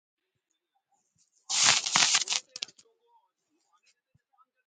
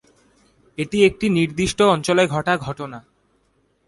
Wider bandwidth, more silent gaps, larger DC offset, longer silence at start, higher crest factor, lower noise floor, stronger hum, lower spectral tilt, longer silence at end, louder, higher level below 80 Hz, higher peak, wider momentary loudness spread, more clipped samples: about the same, 11 kHz vs 11.5 kHz; neither; neither; first, 1.5 s vs 0.8 s; first, 32 dB vs 18 dB; first, -82 dBFS vs -64 dBFS; neither; second, 1.5 dB/octave vs -5 dB/octave; first, 2.25 s vs 0.9 s; second, -24 LUFS vs -19 LUFS; second, -82 dBFS vs -48 dBFS; first, 0 dBFS vs -4 dBFS; about the same, 18 LU vs 16 LU; neither